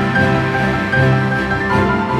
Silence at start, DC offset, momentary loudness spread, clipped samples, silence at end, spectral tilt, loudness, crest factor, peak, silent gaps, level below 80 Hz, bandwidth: 0 s; under 0.1%; 3 LU; under 0.1%; 0 s; -7 dB/octave; -15 LUFS; 12 dB; -2 dBFS; none; -34 dBFS; 11 kHz